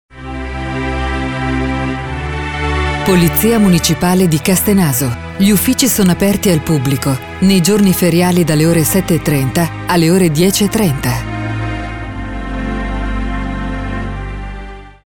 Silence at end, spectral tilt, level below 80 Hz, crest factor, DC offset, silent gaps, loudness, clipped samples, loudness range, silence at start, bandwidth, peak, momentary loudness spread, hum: 0.3 s; -5 dB/octave; -26 dBFS; 14 dB; under 0.1%; none; -14 LUFS; under 0.1%; 8 LU; 0.15 s; over 20 kHz; 0 dBFS; 12 LU; none